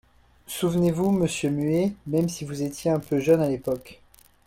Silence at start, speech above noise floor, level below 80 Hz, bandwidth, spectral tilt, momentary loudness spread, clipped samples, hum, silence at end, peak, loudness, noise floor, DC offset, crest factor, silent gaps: 0.5 s; 21 dB; -54 dBFS; 16.5 kHz; -6.5 dB/octave; 9 LU; under 0.1%; none; 0.5 s; -8 dBFS; -25 LUFS; -45 dBFS; under 0.1%; 16 dB; none